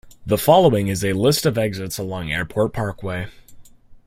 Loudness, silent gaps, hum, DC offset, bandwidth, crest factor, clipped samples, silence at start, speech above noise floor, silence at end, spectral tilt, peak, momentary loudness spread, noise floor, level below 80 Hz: -20 LUFS; none; none; under 0.1%; 16 kHz; 18 dB; under 0.1%; 0.05 s; 24 dB; 0.1 s; -5 dB/octave; -2 dBFS; 14 LU; -43 dBFS; -46 dBFS